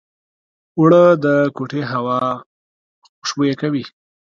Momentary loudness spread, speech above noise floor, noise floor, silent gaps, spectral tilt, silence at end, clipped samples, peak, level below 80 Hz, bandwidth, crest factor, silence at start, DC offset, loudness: 16 LU; over 75 dB; under -90 dBFS; 2.46-3.02 s, 3.09-3.22 s; -6.5 dB/octave; 0.45 s; under 0.1%; 0 dBFS; -64 dBFS; 7.4 kHz; 18 dB; 0.75 s; under 0.1%; -16 LUFS